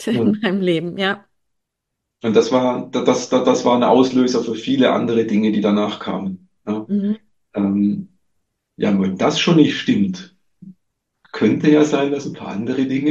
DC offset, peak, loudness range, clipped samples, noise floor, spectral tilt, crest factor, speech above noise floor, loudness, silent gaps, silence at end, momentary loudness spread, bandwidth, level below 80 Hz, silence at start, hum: under 0.1%; 0 dBFS; 5 LU; under 0.1%; -78 dBFS; -6 dB/octave; 18 dB; 62 dB; -18 LUFS; none; 0 s; 12 LU; 8.6 kHz; -64 dBFS; 0 s; none